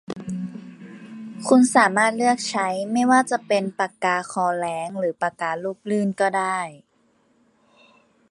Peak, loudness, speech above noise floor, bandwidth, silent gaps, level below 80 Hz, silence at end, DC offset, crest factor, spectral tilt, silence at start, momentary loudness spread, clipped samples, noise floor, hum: -2 dBFS; -22 LUFS; 42 dB; 11.5 kHz; none; -72 dBFS; 1.55 s; under 0.1%; 22 dB; -4.5 dB/octave; 0.1 s; 18 LU; under 0.1%; -63 dBFS; none